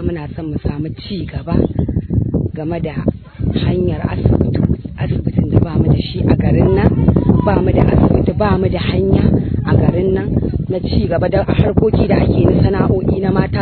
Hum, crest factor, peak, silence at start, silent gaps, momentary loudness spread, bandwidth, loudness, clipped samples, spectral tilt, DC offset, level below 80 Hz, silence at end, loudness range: none; 14 dB; 0 dBFS; 0 s; none; 9 LU; 4.5 kHz; -15 LUFS; 0.2%; -12 dB/octave; under 0.1%; -26 dBFS; 0 s; 5 LU